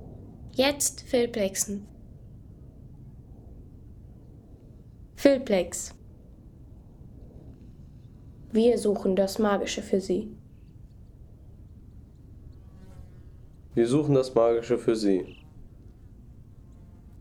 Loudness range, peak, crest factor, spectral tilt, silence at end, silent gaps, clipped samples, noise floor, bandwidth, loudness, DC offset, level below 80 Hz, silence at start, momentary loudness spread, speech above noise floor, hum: 9 LU; -6 dBFS; 24 dB; -4.5 dB/octave; 0 s; none; under 0.1%; -49 dBFS; 19.5 kHz; -26 LUFS; under 0.1%; -52 dBFS; 0 s; 26 LU; 24 dB; none